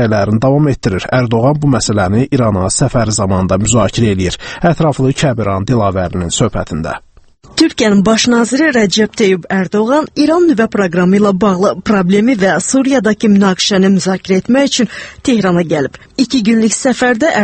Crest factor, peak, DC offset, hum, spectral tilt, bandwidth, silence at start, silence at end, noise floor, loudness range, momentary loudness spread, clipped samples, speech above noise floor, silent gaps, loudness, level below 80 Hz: 12 dB; 0 dBFS; under 0.1%; none; -5 dB/octave; 8.8 kHz; 0 s; 0 s; -36 dBFS; 3 LU; 6 LU; under 0.1%; 24 dB; none; -12 LUFS; -36 dBFS